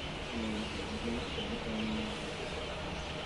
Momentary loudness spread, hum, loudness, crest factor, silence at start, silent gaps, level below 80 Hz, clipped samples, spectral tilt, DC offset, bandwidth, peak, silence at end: 3 LU; none; -38 LUFS; 14 dB; 0 s; none; -48 dBFS; under 0.1%; -4.5 dB/octave; under 0.1%; 11.5 kHz; -24 dBFS; 0 s